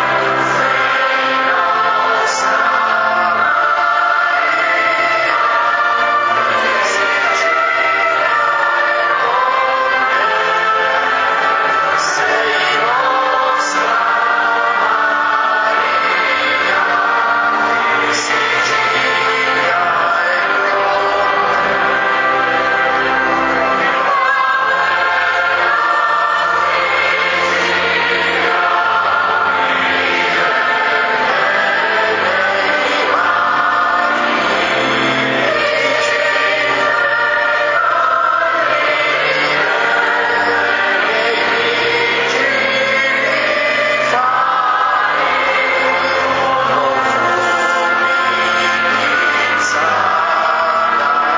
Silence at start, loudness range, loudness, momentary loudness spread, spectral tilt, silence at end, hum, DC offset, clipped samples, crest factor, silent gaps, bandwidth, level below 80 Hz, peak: 0 s; 0 LU; -13 LUFS; 1 LU; -2.5 dB/octave; 0 s; none; under 0.1%; under 0.1%; 14 dB; none; 7.6 kHz; -52 dBFS; 0 dBFS